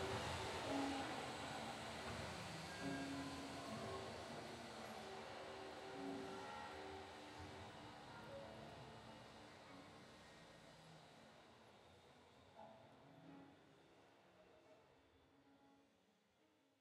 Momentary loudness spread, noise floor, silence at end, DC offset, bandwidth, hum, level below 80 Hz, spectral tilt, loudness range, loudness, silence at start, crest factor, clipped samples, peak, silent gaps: 20 LU; -78 dBFS; 0.35 s; under 0.1%; 15.5 kHz; none; -72 dBFS; -4 dB/octave; 18 LU; -51 LUFS; 0 s; 20 dB; under 0.1%; -32 dBFS; none